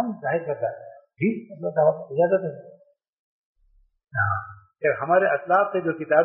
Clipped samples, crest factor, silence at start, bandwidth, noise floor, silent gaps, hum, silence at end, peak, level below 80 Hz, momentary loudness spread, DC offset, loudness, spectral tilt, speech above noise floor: under 0.1%; 20 dB; 0 s; 3.2 kHz; -62 dBFS; 3.09-3.55 s; none; 0 s; -4 dBFS; -64 dBFS; 11 LU; under 0.1%; -24 LUFS; -1.5 dB/octave; 39 dB